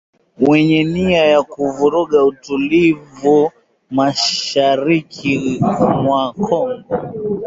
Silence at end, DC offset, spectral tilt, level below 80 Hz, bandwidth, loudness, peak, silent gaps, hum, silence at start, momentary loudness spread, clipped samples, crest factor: 0 s; under 0.1%; -5.5 dB/octave; -48 dBFS; 7.8 kHz; -15 LUFS; -2 dBFS; none; none; 0.4 s; 8 LU; under 0.1%; 14 dB